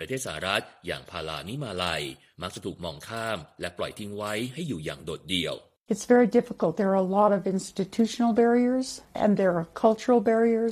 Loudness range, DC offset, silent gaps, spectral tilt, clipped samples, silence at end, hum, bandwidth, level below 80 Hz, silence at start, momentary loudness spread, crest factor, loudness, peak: 9 LU; under 0.1%; 5.81-5.86 s; -5 dB/octave; under 0.1%; 0 s; none; 15 kHz; -58 dBFS; 0 s; 14 LU; 20 dB; -26 LUFS; -8 dBFS